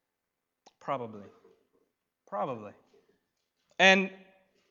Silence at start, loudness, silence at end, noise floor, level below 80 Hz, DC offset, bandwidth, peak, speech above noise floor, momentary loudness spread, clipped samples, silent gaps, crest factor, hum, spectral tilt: 0.85 s; -27 LUFS; 0.55 s; -85 dBFS; -86 dBFS; under 0.1%; 7.4 kHz; -6 dBFS; 57 dB; 25 LU; under 0.1%; none; 28 dB; none; -3.5 dB/octave